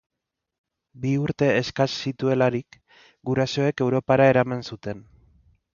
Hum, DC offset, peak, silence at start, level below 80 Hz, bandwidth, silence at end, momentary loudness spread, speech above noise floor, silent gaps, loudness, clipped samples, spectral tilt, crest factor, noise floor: none; under 0.1%; -4 dBFS; 0.95 s; -58 dBFS; 7.2 kHz; 0.75 s; 15 LU; 37 dB; none; -23 LUFS; under 0.1%; -6.5 dB/octave; 20 dB; -59 dBFS